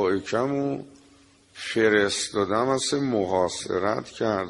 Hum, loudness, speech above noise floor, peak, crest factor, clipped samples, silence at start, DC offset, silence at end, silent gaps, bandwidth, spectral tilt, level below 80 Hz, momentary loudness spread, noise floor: none; -25 LUFS; 31 dB; -6 dBFS; 18 dB; under 0.1%; 0 s; under 0.1%; 0 s; none; 11.5 kHz; -4 dB/octave; -60 dBFS; 8 LU; -56 dBFS